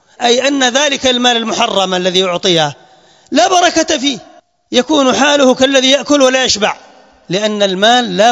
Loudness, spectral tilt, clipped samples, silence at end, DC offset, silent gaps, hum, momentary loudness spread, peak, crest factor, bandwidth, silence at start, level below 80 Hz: -11 LUFS; -2.5 dB/octave; 0.2%; 0 s; under 0.1%; none; none; 7 LU; 0 dBFS; 12 dB; 12 kHz; 0.2 s; -52 dBFS